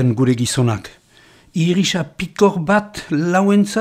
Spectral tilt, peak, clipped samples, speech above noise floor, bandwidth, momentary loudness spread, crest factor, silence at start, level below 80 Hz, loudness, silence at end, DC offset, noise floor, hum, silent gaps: -5.5 dB/octave; -2 dBFS; under 0.1%; 33 dB; 15 kHz; 9 LU; 16 dB; 0 s; -50 dBFS; -17 LUFS; 0 s; under 0.1%; -49 dBFS; none; none